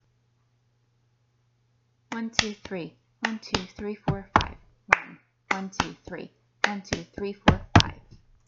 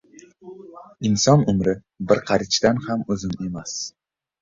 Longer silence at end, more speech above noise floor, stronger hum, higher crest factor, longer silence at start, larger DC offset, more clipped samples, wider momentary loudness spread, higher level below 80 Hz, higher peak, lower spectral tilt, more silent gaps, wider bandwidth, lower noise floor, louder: about the same, 0.5 s vs 0.55 s; first, 39 dB vs 23 dB; neither; first, 30 dB vs 20 dB; first, 2.1 s vs 0.45 s; neither; neither; about the same, 17 LU vs 16 LU; about the same, -46 dBFS vs -50 dBFS; about the same, 0 dBFS vs -2 dBFS; about the same, -4.5 dB/octave vs -5 dB/octave; neither; about the same, 8.2 kHz vs 7.6 kHz; first, -68 dBFS vs -44 dBFS; second, -27 LUFS vs -21 LUFS